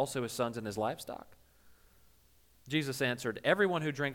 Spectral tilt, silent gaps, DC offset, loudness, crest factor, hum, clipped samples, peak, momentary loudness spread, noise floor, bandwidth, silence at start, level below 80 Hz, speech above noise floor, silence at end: -4.5 dB/octave; none; under 0.1%; -33 LUFS; 18 dB; none; under 0.1%; -16 dBFS; 11 LU; -67 dBFS; 18 kHz; 0 s; -68 dBFS; 33 dB; 0 s